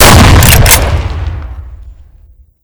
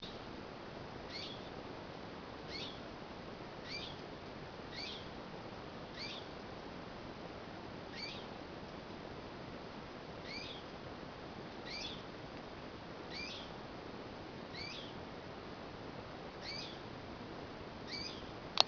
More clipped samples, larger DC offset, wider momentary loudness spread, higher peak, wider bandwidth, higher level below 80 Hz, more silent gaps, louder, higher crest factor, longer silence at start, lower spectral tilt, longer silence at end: first, 10% vs under 0.1%; neither; first, 22 LU vs 5 LU; first, 0 dBFS vs -6 dBFS; first, over 20 kHz vs 5.4 kHz; first, -12 dBFS vs -62 dBFS; neither; first, -5 LUFS vs -47 LUFS; second, 6 dB vs 40 dB; about the same, 0 s vs 0 s; about the same, -3.5 dB/octave vs -2.5 dB/octave; first, 0.75 s vs 0 s